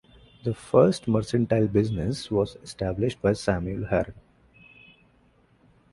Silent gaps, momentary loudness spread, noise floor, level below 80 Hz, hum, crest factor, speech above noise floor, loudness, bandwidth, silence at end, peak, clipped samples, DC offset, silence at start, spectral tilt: none; 12 LU; -61 dBFS; -48 dBFS; none; 22 dB; 37 dB; -25 LUFS; 11.5 kHz; 1.75 s; -4 dBFS; under 0.1%; under 0.1%; 0.45 s; -7 dB/octave